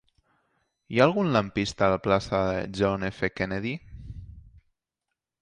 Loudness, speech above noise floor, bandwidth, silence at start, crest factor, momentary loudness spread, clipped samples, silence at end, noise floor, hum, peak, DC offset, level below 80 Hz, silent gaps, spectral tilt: -26 LUFS; 60 dB; 10.5 kHz; 0.9 s; 22 dB; 18 LU; under 0.1%; 1 s; -86 dBFS; none; -6 dBFS; under 0.1%; -50 dBFS; none; -6 dB/octave